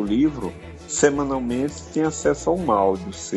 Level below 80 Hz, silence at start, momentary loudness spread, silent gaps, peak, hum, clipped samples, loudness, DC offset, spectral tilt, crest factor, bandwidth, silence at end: -44 dBFS; 0 s; 9 LU; none; -2 dBFS; none; under 0.1%; -22 LUFS; under 0.1%; -5 dB/octave; 20 dB; 11.5 kHz; 0 s